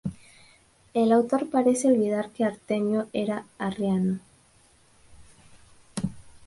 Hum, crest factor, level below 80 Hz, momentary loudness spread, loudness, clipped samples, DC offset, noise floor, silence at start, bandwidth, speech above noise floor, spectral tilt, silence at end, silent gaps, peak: none; 18 dB; -58 dBFS; 12 LU; -26 LUFS; under 0.1%; under 0.1%; -59 dBFS; 0.05 s; 11.5 kHz; 35 dB; -6.5 dB/octave; 0.15 s; none; -10 dBFS